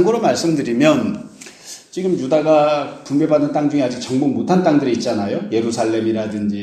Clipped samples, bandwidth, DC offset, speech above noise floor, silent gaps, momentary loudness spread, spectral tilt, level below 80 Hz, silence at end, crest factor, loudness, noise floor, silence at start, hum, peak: under 0.1%; 13 kHz; under 0.1%; 21 dB; none; 10 LU; -6 dB/octave; -58 dBFS; 0 s; 16 dB; -17 LUFS; -38 dBFS; 0 s; none; 0 dBFS